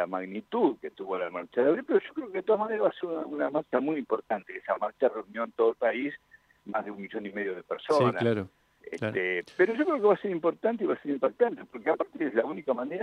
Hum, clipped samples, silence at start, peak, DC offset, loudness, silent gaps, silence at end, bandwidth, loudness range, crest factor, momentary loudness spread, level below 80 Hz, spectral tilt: none; under 0.1%; 0 s; -10 dBFS; under 0.1%; -29 LUFS; none; 0 s; 10.5 kHz; 3 LU; 18 dB; 10 LU; -76 dBFS; -7.5 dB/octave